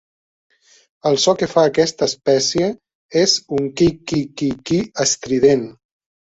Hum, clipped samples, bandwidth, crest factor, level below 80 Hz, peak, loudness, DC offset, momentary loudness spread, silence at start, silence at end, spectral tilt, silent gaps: none; under 0.1%; 8 kHz; 16 dB; -50 dBFS; -2 dBFS; -17 LUFS; under 0.1%; 8 LU; 1.05 s; 0.5 s; -4 dB/octave; 2.95-3.09 s